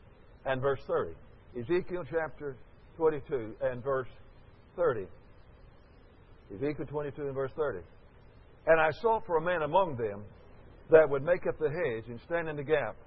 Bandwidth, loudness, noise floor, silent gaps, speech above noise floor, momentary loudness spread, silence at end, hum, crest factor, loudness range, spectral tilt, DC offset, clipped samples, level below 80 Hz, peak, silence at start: 5.8 kHz; -31 LUFS; -56 dBFS; none; 26 dB; 16 LU; 0 s; none; 22 dB; 9 LU; -9.5 dB/octave; under 0.1%; under 0.1%; -56 dBFS; -8 dBFS; 0.45 s